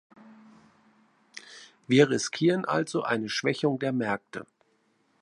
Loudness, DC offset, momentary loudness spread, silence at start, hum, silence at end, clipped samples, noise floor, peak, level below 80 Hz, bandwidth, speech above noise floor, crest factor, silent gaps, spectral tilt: -26 LUFS; under 0.1%; 24 LU; 0.3 s; none; 0.8 s; under 0.1%; -69 dBFS; -8 dBFS; -74 dBFS; 11.5 kHz; 43 dB; 22 dB; none; -5 dB/octave